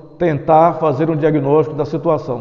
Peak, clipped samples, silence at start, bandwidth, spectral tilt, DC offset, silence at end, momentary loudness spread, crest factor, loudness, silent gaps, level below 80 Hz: 0 dBFS; under 0.1%; 0.05 s; 6.6 kHz; -9.5 dB/octave; under 0.1%; 0 s; 7 LU; 14 dB; -15 LUFS; none; -48 dBFS